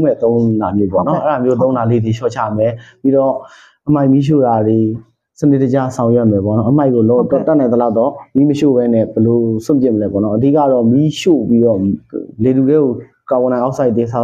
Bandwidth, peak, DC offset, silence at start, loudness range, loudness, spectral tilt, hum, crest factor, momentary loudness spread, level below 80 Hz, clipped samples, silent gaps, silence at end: 9 kHz; 0 dBFS; under 0.1%; 0 s; 2 LU; -13 LUFS; -8.5 dB/octave; none; 12 dB; 6 LU; -50 dBFS; under 0.1%; none; 0 s